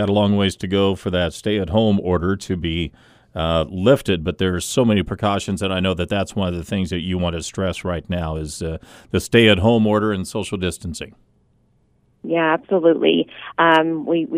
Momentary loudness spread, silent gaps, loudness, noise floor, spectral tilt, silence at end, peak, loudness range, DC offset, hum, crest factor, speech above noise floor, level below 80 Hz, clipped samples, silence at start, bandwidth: 11 LU; none; -19 LUFS; -60 dBFS; -5.5 dB/octave; 0 s; 0 dBFS; 3 LU; under 0.1%; none; 20 dB; 41 dB; -40 dBFS; under 0.1%; 0 s; 15.5 kHz